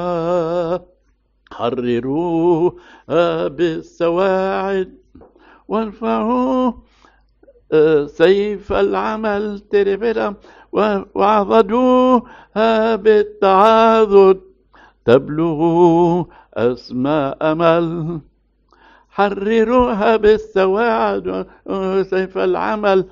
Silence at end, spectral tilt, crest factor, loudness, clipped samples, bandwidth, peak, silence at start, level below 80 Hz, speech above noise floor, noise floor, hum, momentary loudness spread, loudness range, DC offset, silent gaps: 0.05 s; -5 dB/octave; 16 dB; -16 LUFS; under 0.1%; 7.4 kHz; 0 dBFS; 0 s; -46 dBFS; 45 dB; -60 dBFS; none; 10 LU; 6 LU; under 0.1%; none